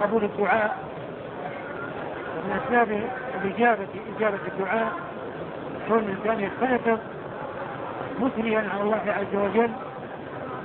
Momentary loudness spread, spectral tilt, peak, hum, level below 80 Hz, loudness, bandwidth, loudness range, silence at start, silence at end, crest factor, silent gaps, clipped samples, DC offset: 12 LU; -10 dB/octave; -8 dBFS; none; -60 dBFS; -27 LUFS; 4.3 kHz; 1 LU; 0 s; 0 s; 20 dB; none; under 0.1%; under 0.1%